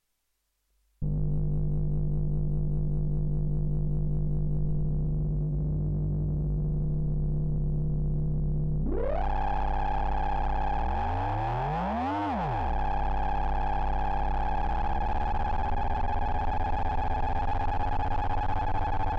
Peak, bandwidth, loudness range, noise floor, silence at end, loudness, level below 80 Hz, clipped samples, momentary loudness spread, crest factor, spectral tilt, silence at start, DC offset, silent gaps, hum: -20 dBFS; 5.4 kHz; 1 LU; -77 dBFS; 0 s; -30 LUFS; -32 dBFS; under 0.1%; 1 LU; 8 dB; -9.5 dB/octave; 1 s; under 0.1%; none; none